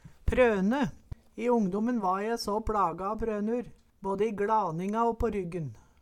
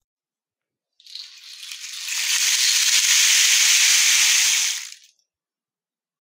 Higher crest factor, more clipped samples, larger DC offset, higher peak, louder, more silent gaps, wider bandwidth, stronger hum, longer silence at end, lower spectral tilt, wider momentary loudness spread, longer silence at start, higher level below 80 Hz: about the same, 18 dB vs 18 dB; neither; neither; second, -12 dBFS vs -4 dBFS; second, -29 LUFS vs -15 LUFS; neither; second, 14 kHz vs 16 kHz; neither; second, 0.2 s vs 1.35 s; first, -6.5 dB/octave vs 11 dB/octave; second, 12 LU vs 21 LU; second, 0.05 s vs 1.15 s; first, -44 dBFS vs under -90 dBFS